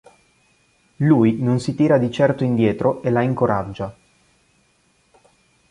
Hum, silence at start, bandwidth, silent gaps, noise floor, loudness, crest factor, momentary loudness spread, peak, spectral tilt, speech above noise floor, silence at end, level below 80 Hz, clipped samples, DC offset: none; 1 s; 11 kHz; none; -61 dBFS; -19 LUFS; 18 dB; 8 LU; -4 dBFS; -8 dB/octave; 43 dB; 1.8 s; -52 dBFS; under 0.1%; under 0.1%